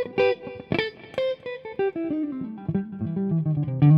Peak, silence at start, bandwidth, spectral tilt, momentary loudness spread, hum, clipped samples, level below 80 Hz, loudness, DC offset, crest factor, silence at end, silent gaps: -8 dBFS; 0 s; 5.6 kHz; -9.5 dB/octave; 8 LU; none; under 0.1%; -58 dBFS; -27 LUFS; under 0.1%; 16 dB; 0 s; none